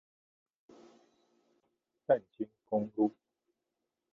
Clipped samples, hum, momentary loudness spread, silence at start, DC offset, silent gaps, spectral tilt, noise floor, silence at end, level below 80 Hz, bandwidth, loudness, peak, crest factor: under 0.1%; none; 12 LU; 2.1 s; under 0.1%; none; -7.5 dB/octave; -87 dBFS; 1.05 s; -82 dBFS; 6.4 kHz; -34 LUFS; -14 dBFS; 24 dB